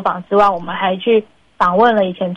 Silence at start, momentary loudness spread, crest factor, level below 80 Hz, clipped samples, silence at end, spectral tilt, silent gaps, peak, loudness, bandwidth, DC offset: 0 s; 6 LU; 14 dB; -52 dBFS; under 0.1%; 0 s; -7 dB/octave; none; -2 dBFS; -15 LUFS; 8.2 kHz; under 0.1%